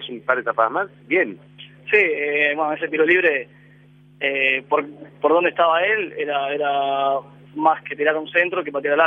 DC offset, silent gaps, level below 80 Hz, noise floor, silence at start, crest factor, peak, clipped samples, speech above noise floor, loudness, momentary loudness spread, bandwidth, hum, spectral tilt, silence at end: under 0.1%; none; -72 dBFS; -50 dBFS; 0 s; 18 dB; -2 dBFS; under 0.1%; 30 dB; -20 LUFS; 9 LU; 4.9 kHz; 50 Hz at -50 dBFS; -6.5 dB/octave; 0 s